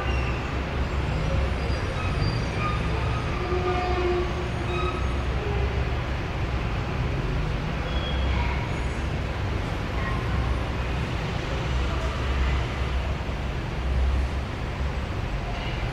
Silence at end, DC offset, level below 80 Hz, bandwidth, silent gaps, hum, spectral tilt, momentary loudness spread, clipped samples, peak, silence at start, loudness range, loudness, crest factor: 0 s; under 0.1%; -30 dBFS; 10 kHz; none; none; -6.5 dB/octave; 4 LU; under 0.1%; -12 dBFS; 0 s; 2 LU; -28 LUFS; 14 dB